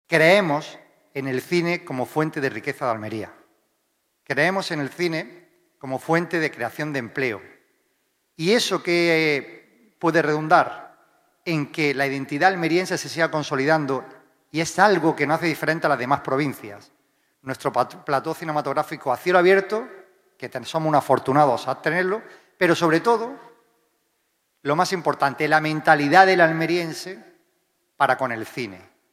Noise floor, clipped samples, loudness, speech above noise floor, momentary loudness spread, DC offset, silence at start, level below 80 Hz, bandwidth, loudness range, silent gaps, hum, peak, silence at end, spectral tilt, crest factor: -71 dBFS; under 0.1%; -21 LUFS; 50 dB; 14 LU; under 0.1%; 0.1 s; -72 dBFS; 16 kHz; 7 LU; none; none; 0 dBFS; 0.35 s; -5 dB/octave; 22 dB